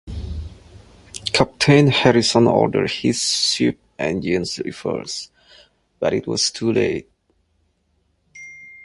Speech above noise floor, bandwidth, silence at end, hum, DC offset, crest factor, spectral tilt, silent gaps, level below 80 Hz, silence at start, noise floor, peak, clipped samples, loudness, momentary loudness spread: 47 dB; 11.5 kHz; 0.1 s; none; under 0.1%; 20 dB; -4.5 dB/octave; none; -42 dBFS; 0.05 s; -66 dBFS; 0 dBFS; under 0.1%; -19 LUFS; 21 LU